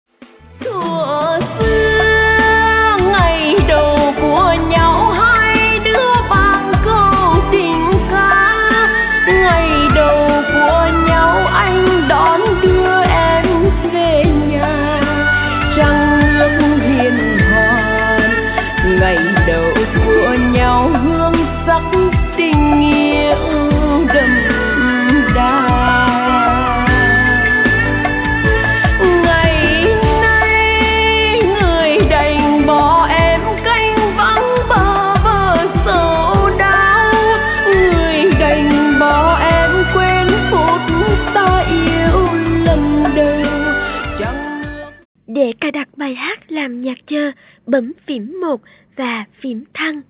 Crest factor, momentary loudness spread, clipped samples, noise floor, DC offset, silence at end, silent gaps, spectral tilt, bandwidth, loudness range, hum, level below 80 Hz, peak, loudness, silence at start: 12 dB; 9 LU; under 0.1%; -41 dBFS; under 0.1%; 0.1 s; 45.05-45.15 s; -9.5 dB/octave; 4 kHz; 5 LU; none; -22 dBFS; 0 dBFS; -12 LUFS; 0.6 s